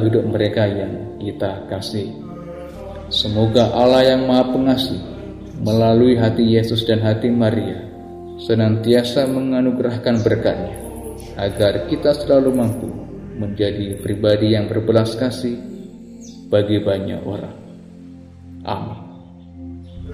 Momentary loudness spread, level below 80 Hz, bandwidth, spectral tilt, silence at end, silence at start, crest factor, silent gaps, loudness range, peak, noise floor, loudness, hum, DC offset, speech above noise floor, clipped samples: 19 LU; -44 dBFS; 15.5 kHz; -7 dB/octave; 0 s; 0 s; 18 dB; none; 8 LU; 0 dBFS; -39 dBFS; -18 LUFS; none; 0.1%; 22 dB; under 0.1%